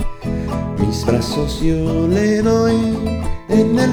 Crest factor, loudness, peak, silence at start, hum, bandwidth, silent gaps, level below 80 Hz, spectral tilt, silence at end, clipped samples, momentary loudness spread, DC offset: 14 dB; -17 LUFS; -2 dBFS; 0 s; none; 15.5 kHz; none; -28 dBFS; -6.5 dB/octave; 0 s; under 0.1%; 8 LU; under 0.1%